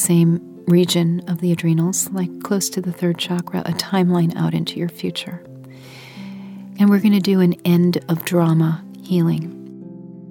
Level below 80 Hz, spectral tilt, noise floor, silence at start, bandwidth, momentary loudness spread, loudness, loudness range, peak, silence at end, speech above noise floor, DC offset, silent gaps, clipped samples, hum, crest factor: -64 dBFS; -5.5 dB/octave; -39 dBFS; 0 s; 17.5 kHz; 20 LU; -19 LUFS; 5 LU; -4 dBFS; 0 s; 21 dB; under 0.1%; none; under 0.1%; none; 16 dB